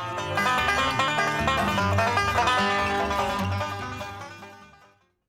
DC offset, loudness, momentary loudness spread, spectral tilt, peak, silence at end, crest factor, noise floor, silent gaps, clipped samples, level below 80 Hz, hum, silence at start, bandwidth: under 0.1%; -24 LUFS; 13 LU; -4 dB/octave; -10 dBFS; 0.65 s; 16 dB; -59 dBFS; none; under 0.1%; -46 dBFS; none; 0 s; 16.5 kHz